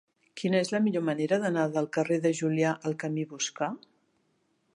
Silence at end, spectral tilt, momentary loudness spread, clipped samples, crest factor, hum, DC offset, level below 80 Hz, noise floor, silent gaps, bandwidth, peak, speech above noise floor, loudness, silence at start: 0.95 s; -5 dB/octave; 8 LU; under 0.1%; 16 dB; none; under 0.1%; -80 dBFS; -72 dBFS; none; 11 kHz; -12 dBFS; 44 dB; -29 LUFS; 0.35 s